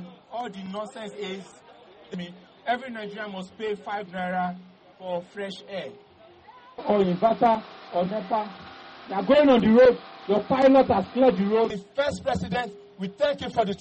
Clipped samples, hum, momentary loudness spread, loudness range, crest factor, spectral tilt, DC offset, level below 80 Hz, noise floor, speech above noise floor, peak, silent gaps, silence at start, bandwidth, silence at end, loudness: under 0.1%; none; 19 LU; 14 LU; 16 dB; -7 dB/octave; under 0.1%; -56 dBFS; -51 dBFS; 27 dB; -8 dBFS; none; 0 s; 8.4 kHz; 0.05 s; -24 LUFS